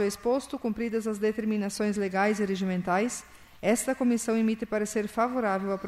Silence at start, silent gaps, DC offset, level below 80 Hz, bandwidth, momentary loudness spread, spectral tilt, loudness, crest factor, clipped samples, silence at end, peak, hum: 0 s; none; under 0.1%; -60 dBFS; 15 kHz; 4 LU; -5 dB/octave; -28 LUFS; 16 dB; under 0.1%; 0 s; -12 dBFS; none